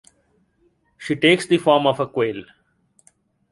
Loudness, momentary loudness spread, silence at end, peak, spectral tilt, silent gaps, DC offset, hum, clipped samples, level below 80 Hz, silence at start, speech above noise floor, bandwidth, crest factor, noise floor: -19 LUFS; 15 LU; 1.1 s; -2 dBFS; -5 dB/octave; none; under 0.1%; none; under 0.1%; -62 dBFS; 1 s; 45 dB; 11.5 kHz; 20 dB; -64 dBFS